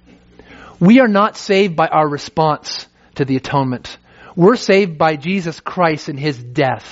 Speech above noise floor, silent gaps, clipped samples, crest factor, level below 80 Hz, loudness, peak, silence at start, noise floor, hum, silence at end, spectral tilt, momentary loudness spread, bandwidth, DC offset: 30 dB; none; under 0.1%; 16 dB; -52 dBFS; -15 LUFS; 0 dBFS; 0.5 s; -45 dBFS; none; 0 s; -5 dB/octave; 13 LU; 7.8 kHz; under 0.1%